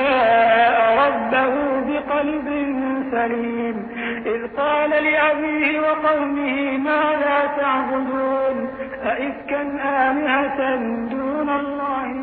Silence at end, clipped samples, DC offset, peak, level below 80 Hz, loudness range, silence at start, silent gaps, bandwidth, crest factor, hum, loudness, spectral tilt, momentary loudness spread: 0 s; under 0.1%; under 0.1%; -6 dBFS; -52 dBFS; 3 LU; 0 s; none; 4.6 kHz; 14 dB; none; -20 LUFS; -8.5 dB/octave; 9 LU